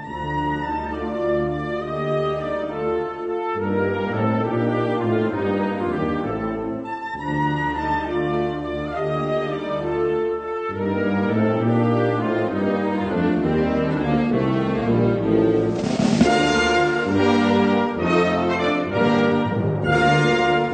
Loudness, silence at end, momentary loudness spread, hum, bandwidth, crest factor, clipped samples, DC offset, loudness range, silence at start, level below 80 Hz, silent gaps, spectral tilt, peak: -21 LUFS; 0 s; 8 LU; none; 9.2 kHz; 18 dB; under 0.1%; under 0.1%; 5 LU; 0 s; -44 dBFS; none; -6.5 dB/octave; -4 dBFS